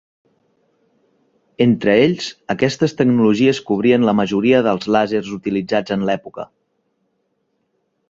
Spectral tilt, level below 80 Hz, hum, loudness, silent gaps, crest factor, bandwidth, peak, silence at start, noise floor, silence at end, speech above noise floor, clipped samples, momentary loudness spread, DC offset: -6.5 dB/octave; -56 dBFS; none; -17 LUFS; none; 18 dB; 7.8 kHz; 0 dBFS; 1.6 s; -68 dBFS; 1.65 s; 52 dB; under 0.1%; 10 LU; under 0.1%